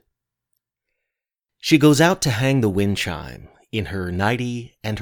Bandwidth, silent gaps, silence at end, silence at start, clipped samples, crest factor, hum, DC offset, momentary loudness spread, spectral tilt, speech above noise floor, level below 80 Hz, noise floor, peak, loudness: 19 kHz; none; 0 s; 1.65 s; under 0.1%; 20 dB; none; under 0.1%; 15 LU; -5 dB/octave; 66 dB; -48 dBFS; -85 dBFS; -2 dBFS; -20 LUFS